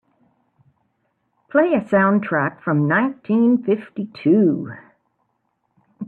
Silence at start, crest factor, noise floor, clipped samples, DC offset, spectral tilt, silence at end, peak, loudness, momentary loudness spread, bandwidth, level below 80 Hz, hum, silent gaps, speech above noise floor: 1.55 s; 16 dB; -70 dBFS; under 0.1%; under 0.1%; -10 dB/octave; 0 s; -4 dBFS; -19 LUFS; 9 LU; 4.4 kHz; -66 dBFS; none; none; 52 dB